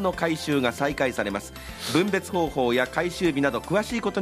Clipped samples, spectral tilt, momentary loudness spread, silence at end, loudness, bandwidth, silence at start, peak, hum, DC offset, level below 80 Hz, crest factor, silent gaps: under 0.1%; -5 dB/octave; 6 LU; 0 s; -25 LUFS; 15.5 kHz; 0 s; -8 dBFS; none; under 0.1%; -48 dBFS; 18 dB; none